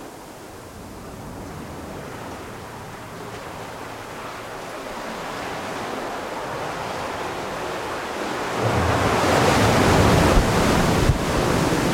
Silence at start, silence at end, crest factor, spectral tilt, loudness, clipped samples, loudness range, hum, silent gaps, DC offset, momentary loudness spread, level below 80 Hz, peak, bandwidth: 0 s; 0 s; 18 dB; -5 dB/octave; -22 LUFS; under 0.1%; 16 LU; none; none; under 0.1%; 19 LU; -34 dBFS; -4 dBFS; 16.5 kHz